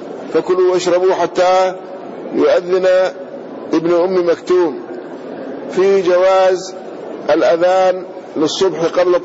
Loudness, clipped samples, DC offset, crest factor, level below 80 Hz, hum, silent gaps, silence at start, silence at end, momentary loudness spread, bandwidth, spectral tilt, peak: -14 LUFS; under 0.1%; under 0.1%; 10 dB; -60 dBFS; none; none; 0 s; 0 s; 17 LU; 8 kHz; -5 dB/octave; -4 dBFS